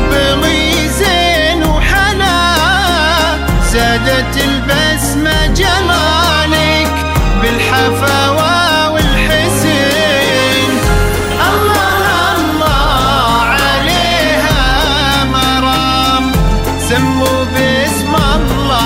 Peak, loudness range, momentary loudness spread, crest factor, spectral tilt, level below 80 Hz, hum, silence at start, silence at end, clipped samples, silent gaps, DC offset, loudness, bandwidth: 0 dBFS; 1 LU; 3 LU; 10 dB; -4 dB/octave; -18 dBFS; none; 0 s; 0 s; under 0.1%; none; under 0.1%; -11 LUFS; 16.5 kHz